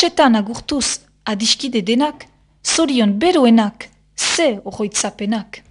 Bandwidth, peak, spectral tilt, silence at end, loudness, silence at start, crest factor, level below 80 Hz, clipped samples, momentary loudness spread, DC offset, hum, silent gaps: 11 kHz; 0 dBFS; -3 dB/octave; 0.1 s; -17 LUFS; 0 s; 18 dB; -50 dBFS; under 0.1%; 11 LU; under 0.1%; none; none